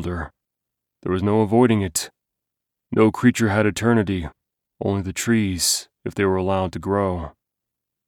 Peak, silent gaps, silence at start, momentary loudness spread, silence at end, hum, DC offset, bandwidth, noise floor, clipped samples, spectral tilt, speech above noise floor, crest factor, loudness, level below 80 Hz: -4 dBFS; none; 0 s; 14 LU; 0.8 s; none; under 0.1%; 19 kHz; -83 dBFS; under 0.1%; -5 dB/octave; 63 dB; 18 dB; -21 LUFS; -46 dBFS